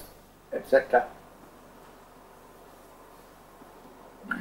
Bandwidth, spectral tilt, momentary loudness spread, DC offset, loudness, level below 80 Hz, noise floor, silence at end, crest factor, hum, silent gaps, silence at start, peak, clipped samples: 16 kHz; -5 dB/octave; 27 LU; under 0.1%; -27 LUFS; -60 dBFS; -52 dBFS; 0 s; 26 dB; 50 Hz at -65 dBFS; none; 0 s; -6 dBFS; under 0.1%